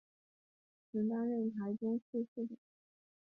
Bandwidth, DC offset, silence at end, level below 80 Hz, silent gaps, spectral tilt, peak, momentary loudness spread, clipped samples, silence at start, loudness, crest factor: 2 kHz; under 0.1%; 0.7 s; -84 dBFS; 2.02-2.13 s, 2.28-2.36 s; -10.5 dB/octave; -28 dBFS; 9 LU; under 0.1%; 0.95 s; -39 LUFS; 12 dB